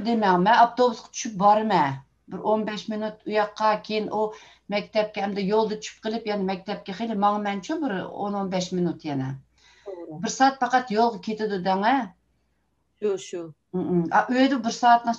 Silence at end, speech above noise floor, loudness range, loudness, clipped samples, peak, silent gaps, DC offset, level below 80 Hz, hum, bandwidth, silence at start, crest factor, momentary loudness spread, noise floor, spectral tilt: 0 s; 48 dB; 4 LU; -24 LUFS; under 0.1%; -6 dBFS; none; under 0.1%; -64 dBFS; none; 8.2 kHz; 0 s; 18 dB; 12 LU; -71 dBFS; -5 dB/octave